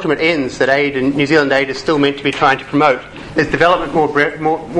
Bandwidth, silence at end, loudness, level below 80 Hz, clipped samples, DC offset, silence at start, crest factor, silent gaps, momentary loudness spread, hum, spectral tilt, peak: 10.5 kHz; 0 s; -14 LUFS; -42 dBFS; under 0.1%; under 0.1%; 0 s; 14 dB; none; 4 LU; none; -5.5 dB/octave; 0 dBFS